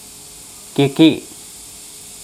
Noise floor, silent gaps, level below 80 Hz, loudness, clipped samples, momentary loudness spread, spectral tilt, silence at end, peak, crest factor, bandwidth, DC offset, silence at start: -38 dBFS; none; -56 dBFS; -15 LUFS; under 0.1%; 22 LU; -5 dB/octave; 1 s; 0 dBFS; 20 dB; 15 kHz; under 0.1%; 0.75 s